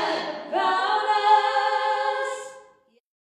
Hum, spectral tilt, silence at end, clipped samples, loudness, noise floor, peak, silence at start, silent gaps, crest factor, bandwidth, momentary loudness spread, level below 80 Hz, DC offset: none; -1.5 dB/octave; 0.75 s; under 0.1%; -23 LUFS; -57 dBFS; -8 dBFS; 0 s; none; 16 dB; 11 kHz; 11 LU; -78 dBFS; under 0.1%